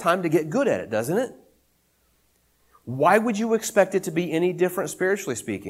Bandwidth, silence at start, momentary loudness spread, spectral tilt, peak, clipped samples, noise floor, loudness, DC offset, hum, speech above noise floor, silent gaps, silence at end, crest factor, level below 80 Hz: 16 kHz; 0 s; 7 LU; -5 dB/octave; -4 dBFS; under 0.1%; -66 dBFS; -23 LUFS; under 0.1%; none; 43 dB; none; 0 s; 20 dB; -66 dBFS